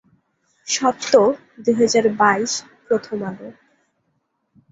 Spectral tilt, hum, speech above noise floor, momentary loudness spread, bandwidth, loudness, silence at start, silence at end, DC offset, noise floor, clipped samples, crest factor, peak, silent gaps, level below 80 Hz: -3.5 dB/octave; none; 52 dB; 15 LU; 8 kHz; -19 LUFS; 0.65 s; 1.2 s; under 0.1%; -70 dBFS; under 0.1%; 18 dB; -2 dBFS; none; -64 dBFS